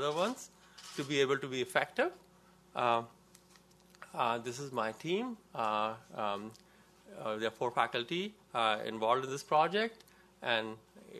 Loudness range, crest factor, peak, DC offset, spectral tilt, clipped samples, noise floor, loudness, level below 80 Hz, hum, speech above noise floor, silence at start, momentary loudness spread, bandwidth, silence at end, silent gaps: 4 LU; 24 dB; -12 dBFS; under 0.1%; -4 dB/octave; under 0.1%; -63 dBFS; -35 LUFS; -76 dBFS; none; 28 dB; 0 s; 13 LU; 14 kHz; 0 s; none